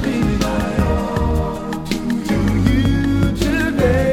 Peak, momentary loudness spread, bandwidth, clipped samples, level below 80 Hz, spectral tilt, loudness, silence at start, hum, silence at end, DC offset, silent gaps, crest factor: -2 dBFS; 6 LU; 16.5 kHz; under 0.1%; -24 dBFS; -6.5 dB/octave; -18 LUFS; 0 s; none; 0 s; under 0.1%; none; 16 dB